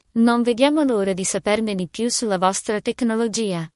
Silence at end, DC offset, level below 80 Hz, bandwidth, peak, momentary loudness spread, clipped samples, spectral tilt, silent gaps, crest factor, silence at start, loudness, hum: 0.1 s; under 0.1%; -58 dBFS; 11.5 kHz; -4 dBFS; 6 LU; under 0.1%; -4 dB/octave; none; 18 dB; 0.15 s; -20 LUFS; none